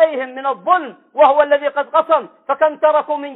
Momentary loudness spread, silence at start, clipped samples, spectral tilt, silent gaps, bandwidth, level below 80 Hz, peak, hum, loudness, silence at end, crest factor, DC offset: 9 LU; 0 s; under 0.1%; -6.5 dB/octave; none; 4.1 kHz; -66 dBFS; -2 dBFS; none; -16 LUFS; 0 s; 14 dB; under 0.1%